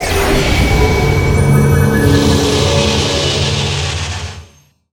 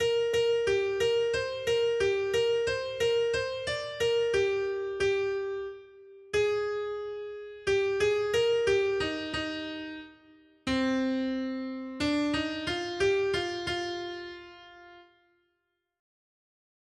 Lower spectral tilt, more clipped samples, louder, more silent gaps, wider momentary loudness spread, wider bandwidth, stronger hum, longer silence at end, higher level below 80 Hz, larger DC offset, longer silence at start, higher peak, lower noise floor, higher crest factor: about the same, -5 dB/octave vs -4 dB/octave; neither; first, -12 LUFS vs -29 LUFS; neither; second, 7 LU vs 12 LU; first, 18.5 kHz vs 12.5 kHz; neither; second, 0.5 s vs 1.95 s; first, -22 dBFS vs -58 dBFS; neither; about the same, 0 s vs 0 s; first, 0 dBFS vs -16 dBFS; second, -45 dBFS vs -80 dBFS; about the same, 12 dB vs 14 dB